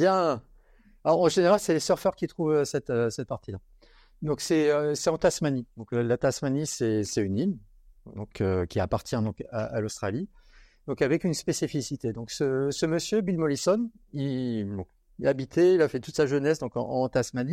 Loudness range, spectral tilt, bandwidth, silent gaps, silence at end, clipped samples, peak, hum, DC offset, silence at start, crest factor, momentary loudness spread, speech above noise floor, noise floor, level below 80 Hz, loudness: 4 LU; -5.5 dB/octave; 16 kHz; none; 0 s; under 0.1%; -10 dBFS; none; under 0.1%; 0 s; 18 dB; 12 LU; 31 dB; -58 dBFS; -56 dBFS; -27 LUFS